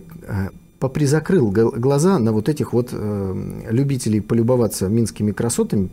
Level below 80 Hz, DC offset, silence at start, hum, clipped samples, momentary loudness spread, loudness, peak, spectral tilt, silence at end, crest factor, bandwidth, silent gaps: -46 dBFS; under 0.1%; 0 s; none; under 0.1%; 10 LU; -19 LUFS; -6 dBFS; -7 dB/octave; 0 s; 12 dB; 16 kHz; none